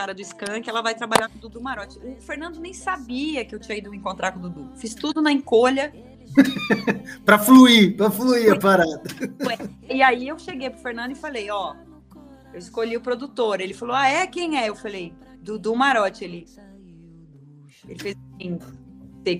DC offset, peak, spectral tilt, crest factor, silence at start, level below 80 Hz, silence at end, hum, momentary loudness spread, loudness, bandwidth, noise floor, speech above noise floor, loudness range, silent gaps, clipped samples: under 0.1%; 0 dBFS; -4.5 dB/octave; 22 dB; 0 s; -54 dBFS; 0 s; none; 18 LU; -20 LUFS; 16 kHz; -48 dBFS; 27 dB; 14 LU; none; under 0.1%